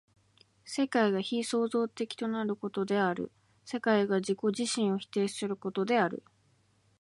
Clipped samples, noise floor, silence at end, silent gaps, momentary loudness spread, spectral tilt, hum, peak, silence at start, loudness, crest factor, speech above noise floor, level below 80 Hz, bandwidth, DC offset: under 0.1%; -69 dBFS; 0.8 s; none; 7 LU; -5 dB/octave; none; -14 dBFS; 0.65 s; -31 LUFS; 18 dB; 38 dB; -76 dBFS; 11.5 kHz; under 0.1%